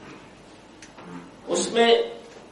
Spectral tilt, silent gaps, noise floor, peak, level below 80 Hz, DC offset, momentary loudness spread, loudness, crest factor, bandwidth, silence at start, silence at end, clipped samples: -2.5 dB/octave; none; -48 dBFS; -6 dBFS; -64 dBFS; under 0.1%; 26 LU; -22 LUFS; 22 dB; 11 kHz; 0 s; 0.1 s; under 0.1%